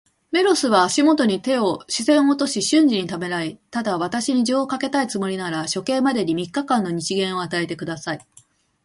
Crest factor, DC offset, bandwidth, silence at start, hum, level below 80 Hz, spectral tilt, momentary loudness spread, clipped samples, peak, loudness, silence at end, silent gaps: 18 dB; under 0.1%; 11.5 kHz; 0.3 s; none; -62 dBFS; -4 dB/octave; 10 LU; under 0.1%; -4 dBFS; -21 LUFS; 0.65 s; none